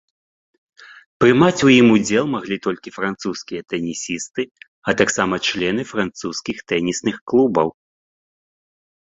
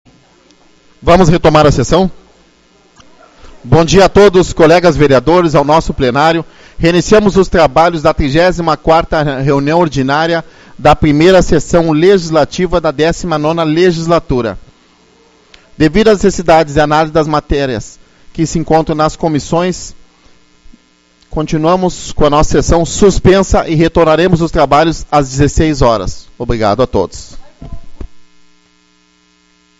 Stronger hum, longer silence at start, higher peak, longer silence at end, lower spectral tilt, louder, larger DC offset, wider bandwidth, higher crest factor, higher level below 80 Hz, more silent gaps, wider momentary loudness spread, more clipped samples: neither; about the same, 0.9 s vs 1 s; about the same, -2 dBFS vs 0 dBFS; second, 1.45 s vs 1.6 s; second, -4.5 dB/octave vs -6 dB/octave; second, -19 LUFS vs -10 LUFS; neither; second, 8 kHz vs 9.6 kHz; first, 18 dB vs 10 dB; second, -54 dBFS vs -26 dBFS; first, 1.06-1.20 s, 4.51-4.55 s, 4.68-4.82 s, 7.21-7.27 s vs none; first, 14 LU vs 9 LU; second, under 0.1% vs 1%